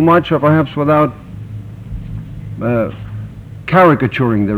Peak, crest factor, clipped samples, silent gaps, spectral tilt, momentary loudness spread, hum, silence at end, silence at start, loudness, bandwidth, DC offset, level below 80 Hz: 0 dBFS; 14 dB; under 0.1%; none; -9 dB/octave; 19 LU; none; 0 s; 0 s; -13 LUFS; 14.5 kHz; under 0.1%; -36 dBFS